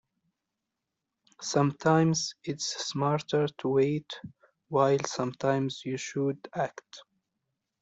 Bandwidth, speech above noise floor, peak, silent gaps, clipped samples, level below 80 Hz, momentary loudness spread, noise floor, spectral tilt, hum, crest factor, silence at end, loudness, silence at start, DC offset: 8.2 kHz; 57 dB; -10 dBFS; none; under 0.1%; -70 dBFS; 10 LU; -86 dBFS; -5 dB/octave; none; 20 dB; 0.8 s; -29 LUFS; 1.4 s; under 0.1%